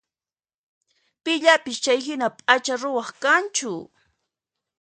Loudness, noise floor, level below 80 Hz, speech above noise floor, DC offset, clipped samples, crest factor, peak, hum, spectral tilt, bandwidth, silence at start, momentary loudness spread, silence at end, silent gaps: -21 LUFS; under -90 dBFS; -76 dBFS; over 68 dB; under 0.1%; under 0.1%; 24 dB; 0 dBFS; none; -1.5 dB/octave; 9.6 kHz; 1.25 s; 11 LU; 0.95 s; none